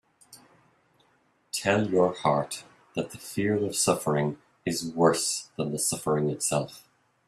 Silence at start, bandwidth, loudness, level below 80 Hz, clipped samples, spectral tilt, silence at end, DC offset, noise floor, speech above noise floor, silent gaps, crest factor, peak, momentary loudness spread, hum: 0.3 s; 15.5 kHz; -27 LUFS; -66 dBFS; under 0.1%; -4 dB/octave; 0.5 s; under 0.1%; -67 dBFS; 40 dB; none; 22 dB; -6 dBFS; 11 LU; none